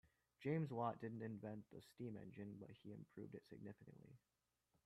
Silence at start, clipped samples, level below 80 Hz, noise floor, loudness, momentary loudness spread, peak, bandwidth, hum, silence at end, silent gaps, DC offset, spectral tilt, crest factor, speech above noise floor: 0.05 s; under 0.1%; -84 dBFS; -87 dBFS; -51 LUFS; 18 LU; -30 dBFS; 13.5 kHz; none; 0.7 s; none; under 0.1%; -8.5 dB/octave; 22 dB; 36 dB